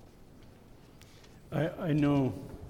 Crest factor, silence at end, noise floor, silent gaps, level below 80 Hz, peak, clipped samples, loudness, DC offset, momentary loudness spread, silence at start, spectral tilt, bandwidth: 16 dB; 0 s; -55 dBFS; none; -56 dBFS; -18 dBFS; under 0.1%; -31 LUFS; under 0.1%; 7 LU; 0.05 s; -8.5 dB/octave; 15.5 kHz